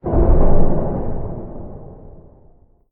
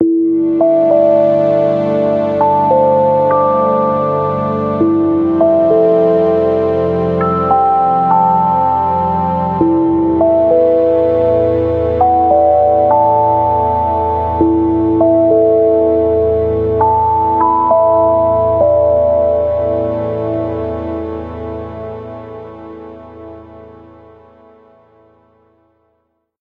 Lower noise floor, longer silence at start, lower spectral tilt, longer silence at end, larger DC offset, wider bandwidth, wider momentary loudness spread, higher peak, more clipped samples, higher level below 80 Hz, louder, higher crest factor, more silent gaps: second, -49 dBFS vs -64 dBFS; about the same, 0.05 s vs 0 s; first, -12.5 dB/octave vs -10.5 dB/octave; second, 1.05 s vs 2.7 s; neither; second, 1.9 kHz vs 4.7 kHz; first, 22 LU vs 11 LU; about the same, 0 dBFS vs 0 dBFS; neither; first, -18 dBFS vs -36 dBFS; second, -20 LUFS vs -12 LUFS; about the same, 14 dB vs 12 dB; neither